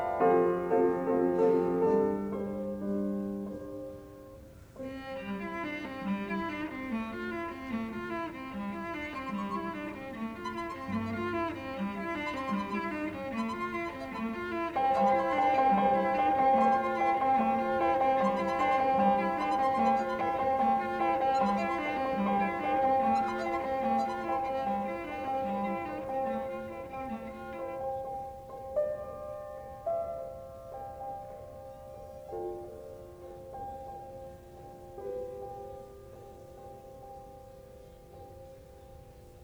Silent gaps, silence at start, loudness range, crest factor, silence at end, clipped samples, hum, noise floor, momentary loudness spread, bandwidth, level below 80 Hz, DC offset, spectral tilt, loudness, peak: none; 0 s; 17 LU; 18 dB; 0 s; under 0.1%; none; -51 dBFS; 21 LU; over 20 kHz; -58 dBFS; under 0.1%; -7 dB/octave; -31 LUFS; -14 dBFS